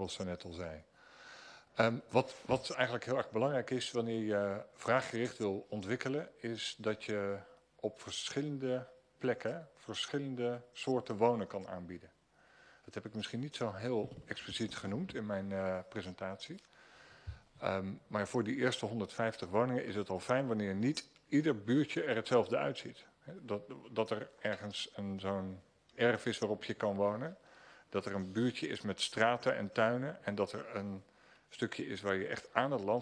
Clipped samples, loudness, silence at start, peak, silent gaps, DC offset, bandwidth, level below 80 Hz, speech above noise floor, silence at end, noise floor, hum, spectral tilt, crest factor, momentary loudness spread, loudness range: under 0.1%; -37 LUFS; 0 s; -12 dBFS; none; under 0.1%; 11 kHz; -70 dBFS; 29 dB; 0 s; -66 dBFS; none; -5.5 dB/octave; 26 dB; 13 LU; 6 LU